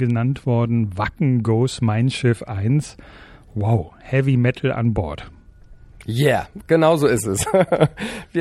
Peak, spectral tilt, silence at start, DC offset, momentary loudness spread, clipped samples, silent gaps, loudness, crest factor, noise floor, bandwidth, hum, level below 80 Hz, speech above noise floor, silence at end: -2 dBFS; -6.5 dB/octave; 0 s; under 0.1%; 9 LU; under 0.1%; none; -20 LUFS; 18 dB; -44 dBFS; 13.5 kHz; none; -44 dBFS; 25 dB; 0 s